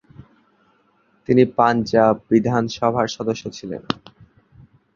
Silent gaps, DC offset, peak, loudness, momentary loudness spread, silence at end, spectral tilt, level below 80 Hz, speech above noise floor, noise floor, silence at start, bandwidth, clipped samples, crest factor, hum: none; under 0.1%; -2 dBFS; -19 LUFS; 12 LU; 1 s; -6.5 dB/octave; -54 dBFS; 43 dB; -61 dBFS; 1.3 s; 7.4 kHz; under 0.1%; 20 dB; none